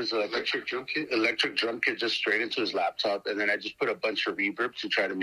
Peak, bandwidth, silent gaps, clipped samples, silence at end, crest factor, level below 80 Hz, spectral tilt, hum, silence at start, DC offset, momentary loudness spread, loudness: -10 dBFS; 14 kHz; none; under 0.1%; 0 s; 20 dB; -74 dBFS; -3 dB/octave; none; 0 s; under 0.1%; 4 LU; -28 LUFS